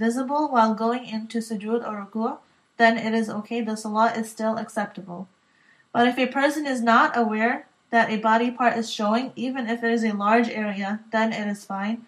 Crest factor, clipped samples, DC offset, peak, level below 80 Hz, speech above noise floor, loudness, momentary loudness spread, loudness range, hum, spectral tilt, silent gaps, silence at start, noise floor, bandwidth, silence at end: 20 dB; under 0.1%; under 0.1%; -4 dBFS; -82 dBFS; 36 dB; -23 LUFS; 10 LU; 4 LU; none; -5 dB/octave; none; 0 s; -60 dBFS; 13 kHz; 0 s